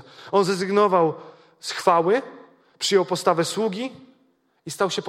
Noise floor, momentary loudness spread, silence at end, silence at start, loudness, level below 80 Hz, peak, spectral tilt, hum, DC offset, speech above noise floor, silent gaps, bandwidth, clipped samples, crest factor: -64 dBFS; 16 LU; 0 s; 0.2 s; -22 LUFS; -74 dBFS; -4 dBFS; -4 dB/octave; none; under 0.1%; 43 dB; none; 15.5 kHz; under 0.1%; 20 dB